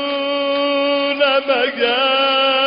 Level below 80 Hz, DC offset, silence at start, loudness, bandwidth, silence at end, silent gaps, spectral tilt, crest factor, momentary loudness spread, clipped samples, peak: -62 dBFS; under 0.1%; 0 s; -16 LUFS; 5.2 kHz; 0 s; none; 2 dB/octave; 12 dB; 4 LU; under 0.1%; -6 dBFS